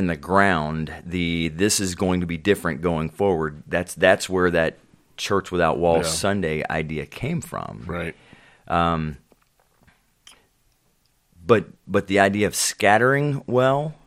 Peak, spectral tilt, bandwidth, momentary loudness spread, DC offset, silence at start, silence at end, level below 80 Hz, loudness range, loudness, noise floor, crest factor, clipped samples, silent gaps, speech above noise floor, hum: 0 dBFS; -4.5 dB/octave; 16.5 kHz; 12 LU; under 0.1%; 0 s; 0.15 s; -50 dBFS; 8 LU; -22 LUFS; -65 dBFS; 22 dB; under 0.1%; none; 43 dB; none